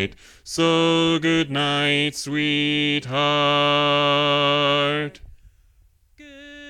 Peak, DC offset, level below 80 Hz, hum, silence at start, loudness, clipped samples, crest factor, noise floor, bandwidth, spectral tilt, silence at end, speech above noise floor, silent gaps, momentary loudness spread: -8 dBFS; under 0.1%; -54 dBFS; none; 0 s; -19 LUFS; under 0.1%; 14 dB; -57 dBFS; 14 kHz; -4.5 dB/octave; 0 s; 37 dB; none; 6 LU